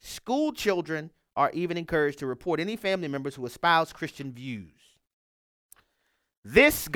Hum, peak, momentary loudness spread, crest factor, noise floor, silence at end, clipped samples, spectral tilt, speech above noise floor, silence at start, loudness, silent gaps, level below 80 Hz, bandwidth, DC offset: none; -4 dBFS; 15 LU; 26 dB; -75 dBFS; 0 s; under 0.1%; -4.5 dB/octave; 49 dB; 0.05 s; -27 LUFS; 5.13-5.69 s, 6.37-6.43 s; -54 dBFS; 19 kHz; under 0.1%